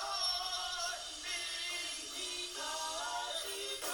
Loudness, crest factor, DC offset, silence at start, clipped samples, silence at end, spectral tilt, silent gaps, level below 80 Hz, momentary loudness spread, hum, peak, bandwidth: -37 LUFS; 16 dB; under 0.1%; 0 s; under 0.1%; 0 s; 1 dB/octave; none; -66 dBFS; 5 LU; none; -24 dBFS; over 20 kHz